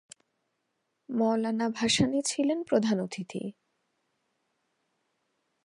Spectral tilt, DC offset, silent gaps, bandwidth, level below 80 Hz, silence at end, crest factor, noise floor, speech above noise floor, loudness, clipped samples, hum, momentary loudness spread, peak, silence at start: -4 dB/octave; under 0.1%; none; 11.5 kHz; -68 dBFS; 2.15 s; 20 dB; -80 dBFS; 52 dB; -28 LUFS; under 0.1%; none; 12 LU; -12 dBFS; 1.1 s